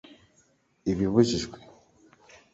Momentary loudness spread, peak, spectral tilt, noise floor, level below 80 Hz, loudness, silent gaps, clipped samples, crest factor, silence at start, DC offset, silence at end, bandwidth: 16 LU; -8 dBFS; -6 dB/octave; -66 dBFS; -52 dBFS; -26 LUFS; none; under 0.1%; 22 dB; 0.85 s; under 0.1%; 0.95 s; 8 kHz